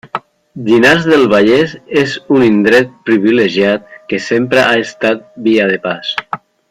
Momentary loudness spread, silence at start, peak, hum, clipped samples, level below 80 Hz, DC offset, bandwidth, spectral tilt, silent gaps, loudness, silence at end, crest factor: 12 LU; 0.05 s; 0 dBFS; none; under 0.1%; -50 dBFS; under 0.1%; 14.5 kHz; -5.5 dB/octave; none; -11 LUFS; 0.35 s; 12 dB